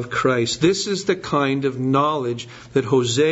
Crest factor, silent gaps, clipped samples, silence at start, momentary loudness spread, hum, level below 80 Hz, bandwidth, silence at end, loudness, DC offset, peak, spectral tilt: 16 dB; none; under 0.1%; 0 s; 6 LU; none; -54 dBFS; 8 kHz; 0 s; -20 LUFS; under 0.1%; -4 dBFS; -5 dB/octave